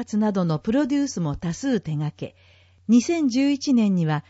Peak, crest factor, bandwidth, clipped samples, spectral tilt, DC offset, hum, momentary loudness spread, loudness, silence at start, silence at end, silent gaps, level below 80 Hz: -8 dBFS; 14 dB; 8 kHz; under 0.1%; -6.5 dB/octave; under 0.1%; none; 10 LU; -22 LUFS; 0 s; 0.1 s; none; -52 dBFS